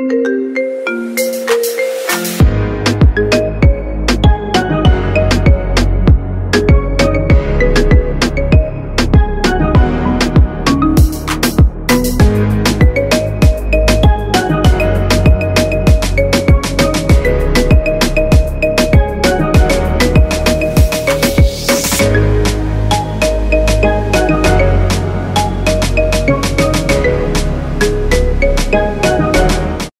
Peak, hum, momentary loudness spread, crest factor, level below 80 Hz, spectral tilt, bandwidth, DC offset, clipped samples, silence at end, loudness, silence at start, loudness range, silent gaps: 0 dBFS; none; 4 LU; 10 dB; -16 dBFS; -5.5 dB/octave; 16.5 kHz; under 0.1%; under 0.1%; 0.1 s; -12 LUFS; 0 s; 2 LU; none